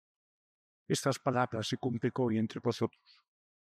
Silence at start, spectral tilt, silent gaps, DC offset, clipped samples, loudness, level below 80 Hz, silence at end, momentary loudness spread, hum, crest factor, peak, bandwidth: 0.9 s; -5.5 dB/octave; none; under 0.1%; under 0.1%; -33 LUFS; -78 dBFS; 0.8 s; 4 LU; none; 18 dB; -16 dBFS; 15 kHz